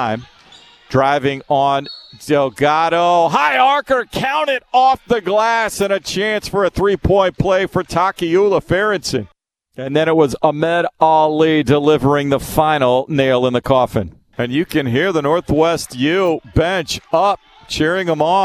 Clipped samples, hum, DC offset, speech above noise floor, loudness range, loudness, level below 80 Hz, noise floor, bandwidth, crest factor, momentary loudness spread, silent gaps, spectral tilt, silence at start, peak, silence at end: under 0.1%; none; under 0.1%; 29 dB; 2 LU; -16 LUFS; -38 dBFS; -45 dBFS; 14 kHz; 16 dB; 6 LU; none; -5.5 dB/octave; 0 s; 0 dBFS; 0 s